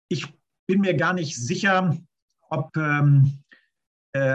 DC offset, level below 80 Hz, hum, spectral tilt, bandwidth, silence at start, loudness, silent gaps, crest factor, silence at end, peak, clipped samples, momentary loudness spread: under 0.1%; -64 dBFS; none; -6 dB/octave; 8.2 kHz; 0.1 s; -23 LUFS; 0.59-0.67 s, 2.22-2.28 s, 3.87-4.13 s; 16 dB; 0 s; -8 dBFS; under 0.1%; 13 LU